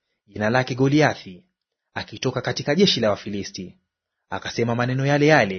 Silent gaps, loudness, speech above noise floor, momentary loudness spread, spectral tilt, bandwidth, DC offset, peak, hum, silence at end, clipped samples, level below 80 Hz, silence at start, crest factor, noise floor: none; -21 LUFS; 49 dB; 17 LU; -5.5 dB/octave; 6.6 kHz; under 0.1%; -2 dBFS; none; 0 s; under 0.1%; -58 dBFS; 0.35 s; 20 dB; -70 dBFS